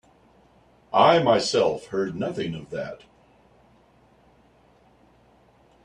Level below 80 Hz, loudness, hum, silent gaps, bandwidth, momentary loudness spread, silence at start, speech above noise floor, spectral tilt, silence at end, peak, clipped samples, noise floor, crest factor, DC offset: -62 dBFS; -23 LUFS; none; none; 10.5 kHz; 16 LU; 0.9 s; 36 dB; -5 dB/octave; 2.9 s; -4 dBFS; under 0.1%; -58 dBFS; 22 dB; under 0.1%